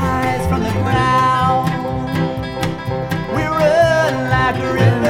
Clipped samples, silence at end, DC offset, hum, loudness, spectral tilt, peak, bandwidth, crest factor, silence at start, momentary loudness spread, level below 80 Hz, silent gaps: under 0.1%; 0 s; under 0.1%; none; -16 LUFS; -6.5 dB/octave; -2 dBFS; 17 kHz; 14 dB; 0 s; 8 LU; -34 dBFS; none